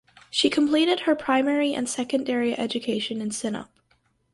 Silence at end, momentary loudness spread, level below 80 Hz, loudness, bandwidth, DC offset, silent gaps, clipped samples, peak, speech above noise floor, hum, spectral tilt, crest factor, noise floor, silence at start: 0.7 s; 8 LU; -64 dBFS; -24 LUFS; 11.5 kHz; under 0.1%; none; under 0.1%; -8 dBFS; 43 dB; none; -3 dB/octave; 18 dB; -67 dBFS; 0.35 s